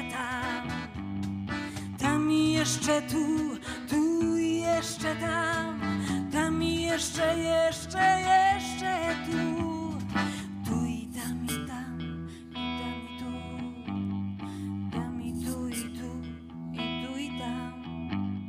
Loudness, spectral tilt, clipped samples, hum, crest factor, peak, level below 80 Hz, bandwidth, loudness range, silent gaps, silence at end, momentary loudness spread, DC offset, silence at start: -30 LUFS; -4.5 dB/octave; under 0.1%; none; 18 dB; -12 dBFS; -52 dBFS; 16 kHz; 9 LU; none; 0 s; 12 LU; under 0.1%; 0 s